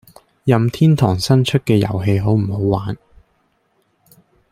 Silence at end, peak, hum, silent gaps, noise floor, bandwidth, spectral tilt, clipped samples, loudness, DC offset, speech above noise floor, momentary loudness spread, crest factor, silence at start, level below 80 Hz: 1.55 s; -2 dBFS; none; none; -63 dBFS; 15 kHz; -7 dB/octave; under 0.1%; -16 LUFS; under 0.1%; 48 dB; 8 LU; 16 dB; 0.45 s; -46 dBFS